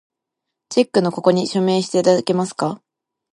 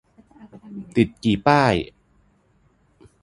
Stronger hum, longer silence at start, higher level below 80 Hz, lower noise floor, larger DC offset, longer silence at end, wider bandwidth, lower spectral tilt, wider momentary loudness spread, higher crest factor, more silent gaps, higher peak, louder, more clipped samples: neither; about the same, 0.7 s vs 0.65 s; second, -66 dBFS vs -48 dBFS; first, -81 dBFS vs -61 dBFS; neither; second, 0.6 s vs 1.35 s; about the same, 11.5 kHz vs 11 kHz; about the same, -5.5 dB/octave vs -6.5 dB/octave; second, 8 LU vs 21 LU; second, 18 dB vs 24 dB; neither; about the same, -2 dBFS vs 0 dBFS; about the same, -18 LUFS vs -20 LUFS; neither